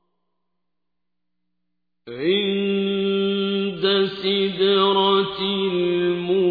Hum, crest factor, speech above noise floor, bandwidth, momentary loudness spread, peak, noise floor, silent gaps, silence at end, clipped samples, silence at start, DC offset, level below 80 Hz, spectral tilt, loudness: 60 Hz at -55 dBFS; 16 dB; 63 dB; 5 kHz; 5 LU; -6 dBFS; -83 dBFS; none; 0 s; under 0.1%; 2.05 s; under 0.1%; -62 dBFS; -8 dB/octave; -20 LUFS